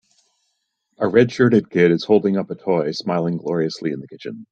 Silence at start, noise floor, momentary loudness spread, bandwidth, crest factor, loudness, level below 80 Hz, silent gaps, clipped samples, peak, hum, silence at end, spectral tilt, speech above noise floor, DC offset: 1 s; -72 dBFS; 12 LU; 8 kHz; 18 dB; -19 LUFS; -62 dBFS; none; under 0.1%; -2 dBFS; none; 0.05 s; -7 dB/octave; 54 dB; under 0.1%